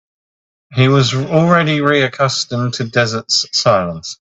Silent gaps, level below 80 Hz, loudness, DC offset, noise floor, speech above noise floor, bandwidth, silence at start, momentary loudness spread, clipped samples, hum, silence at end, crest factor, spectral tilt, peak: none; -50 dBFS; -14 LUFS; under 0.1%; under -90 dBFS; over 76 dB; 8.2 kHz; 0.7 s; 7 LU; under 0.1%; none; 0.05 s; 16 dB; -4.5 dB/octave; 0 dBFS